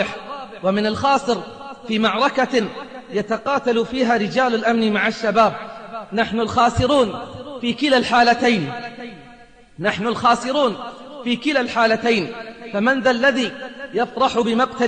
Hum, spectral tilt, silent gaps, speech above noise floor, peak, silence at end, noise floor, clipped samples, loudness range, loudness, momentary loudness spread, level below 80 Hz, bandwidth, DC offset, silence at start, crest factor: none; -5 dB/octave; none; 28 dB; -4 dBFS; 0 s; -46 dBFS; under 0.1%; 2 LU; -19 LUFS; 15 LU; -50 dBFS; 9.6 kHz; 0.2%; 0 s; 16 dB